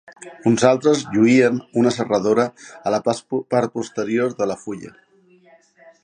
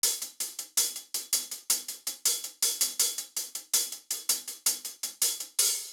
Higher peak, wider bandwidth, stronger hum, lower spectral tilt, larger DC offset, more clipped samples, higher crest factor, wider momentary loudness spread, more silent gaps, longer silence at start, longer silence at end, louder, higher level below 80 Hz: first, 0 dBFS vs -10 dBFS; second, 10 kHz vs over 20 kHz; neither; first, -5.5 dB/octave vs 4 dB/octave; neither; neither; about the same, 20 dB vs 22 dB; about the same, 11 LU vs 9 LU; neither; first, 0.2 s vs 0.05 s; first, 1.15 s vs 0 s; first, -19 LUFS vs -28 LUFS; first, -62 dBFS vs -86 dBFS